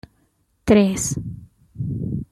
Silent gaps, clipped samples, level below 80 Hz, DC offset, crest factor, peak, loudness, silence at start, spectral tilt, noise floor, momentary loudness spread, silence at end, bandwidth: none; under 0.1%; -44 dBFS; under 0.1%; 18 dB; -4 dBFS; -21 LUFS; 0.65 s; -5.5 dB/octave; -65 dBFS; 18 LU; 0.1 s; 14 kHz